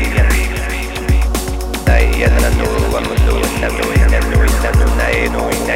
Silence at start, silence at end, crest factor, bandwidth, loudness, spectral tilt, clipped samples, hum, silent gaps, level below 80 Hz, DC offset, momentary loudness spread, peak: 0 s; 0 s; 12 dB; 16.5 kHz; -15 LUFS; -5 dB/octave; under 0.1%; none; none; -14 dBFS; under 0.1%; 6 LU; 0 dBFS